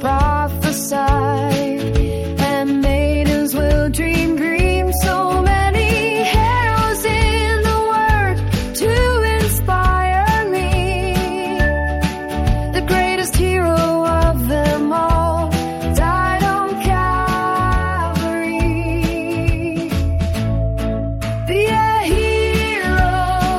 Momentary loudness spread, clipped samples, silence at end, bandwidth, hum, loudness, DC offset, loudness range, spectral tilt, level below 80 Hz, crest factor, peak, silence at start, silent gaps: 4 LU; under 0.1%; 0 s; 16.5 kHz; none; -17 LUFS; under 0.1%; 3 LU; -5.5 dB/octave; -22 dBFS; 14 dB; -2 dBFS; 0 s; none